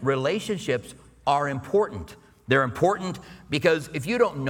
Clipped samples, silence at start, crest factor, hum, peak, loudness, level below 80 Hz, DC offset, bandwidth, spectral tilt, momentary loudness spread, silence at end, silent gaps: under 0.1%; 0 s; 20 dB; none; -6 dBFS; -25 LUFS; -54 dBFS; under 0.1%; 17 kHz; -5.5 dB/octave; 12 LU; 0 s; none